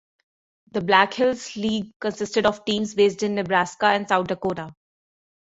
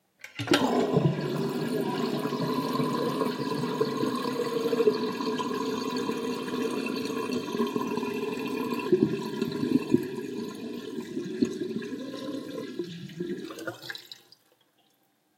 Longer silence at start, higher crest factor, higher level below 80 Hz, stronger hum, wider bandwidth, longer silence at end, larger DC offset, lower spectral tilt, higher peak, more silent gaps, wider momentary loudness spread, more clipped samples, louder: first, 0.75 s vs 0.25 s; about the same, 20 dB vs 22 dB; first, -60 dBFS vs -70 dBFS; neither; second, 8 kHz vs 16.5 kHz; second, 0.85 s vs 1.25 s; neither; second, -4.5 dB/octave vs -6 dB/octave; about the same, -4 dBFS vs -6 dBFS; first, 1.96-2.00 s vs none; about the same, 10 LU vs 12 LU; neither; first, -22 LUFS vs -30 LUFS